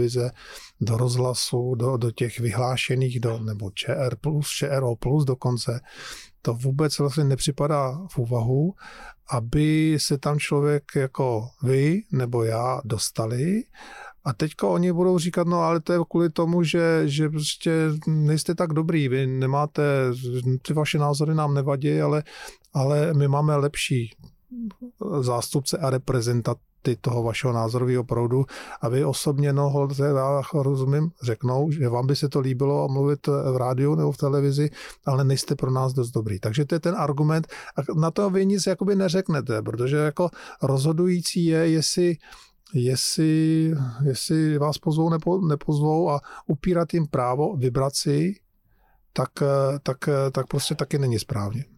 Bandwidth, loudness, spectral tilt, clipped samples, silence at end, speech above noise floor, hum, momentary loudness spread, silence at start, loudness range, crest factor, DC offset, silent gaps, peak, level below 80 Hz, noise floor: 15 kHz; -24 LUFS; -6 dB/octave; under 0.1%; 0.15 s; 39 dB; none; 8 LU; 0 s; 3 LU; 10 dB; under 0.1%; none; -12 dBFS; -52 dBFS; -62 dBFS